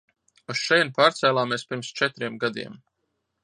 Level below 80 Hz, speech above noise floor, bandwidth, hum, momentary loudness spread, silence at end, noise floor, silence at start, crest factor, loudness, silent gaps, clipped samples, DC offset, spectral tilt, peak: -74 dBFS; 53 dB; 10 kHz; none; 13 LU; 0.7 s; -77 dBFS; 0.5 s; 20 dB; -23 LUFS; none; under 0.1%; under 0.1%; -3.5 dB/octave; -6 dBFS